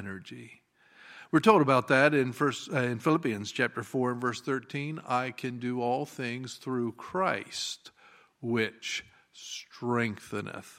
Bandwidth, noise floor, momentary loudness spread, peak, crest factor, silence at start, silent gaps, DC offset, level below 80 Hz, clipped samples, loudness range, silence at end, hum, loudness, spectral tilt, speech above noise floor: 16 kHz; -54 dBFS; 18 LU; -6 dBFS; 24 dB; 0 s; none; under 0.1%; -74 dBFS; under 0.1%; 7 LU; 0.05 s; none; -29 LUFS; -5 dB/octave; 25 dB